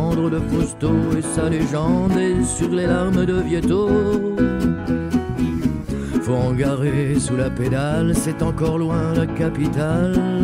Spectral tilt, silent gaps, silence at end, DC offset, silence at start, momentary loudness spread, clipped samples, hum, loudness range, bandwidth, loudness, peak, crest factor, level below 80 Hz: -6.5 dB/octave; none; 0 s; under 0.1%; 0 s; 3 LU; under 0.1%; none; 2 LU; 15.5 kHz; -20 LUFS; -4 dBFS; 14 dB; -34 dBFS